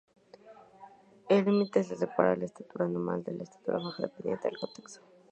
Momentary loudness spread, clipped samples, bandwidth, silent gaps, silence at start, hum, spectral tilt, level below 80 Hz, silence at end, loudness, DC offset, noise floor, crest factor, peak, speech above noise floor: 14 LU; under 0.1%; 8.8 kHz; none; 0.45 s; none; -7 dB/octave; -74 dBFS; 0.35 s; -31 LUFS; under 0.1%; -55 dBFS; 24 dB; -8 dBFS; 24 dB